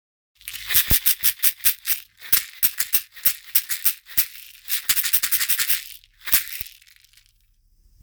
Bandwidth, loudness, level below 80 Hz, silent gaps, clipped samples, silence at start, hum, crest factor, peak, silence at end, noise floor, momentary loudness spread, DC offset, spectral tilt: over 20 kHz; -19 LUFS; -46 dBFS; none; under 0.1%; 0.45 s; none; 24 dB; 0 dBFS; 1.35 s; -60 dBFS; 16 LU; under 0.1%; 0.5 dB/octave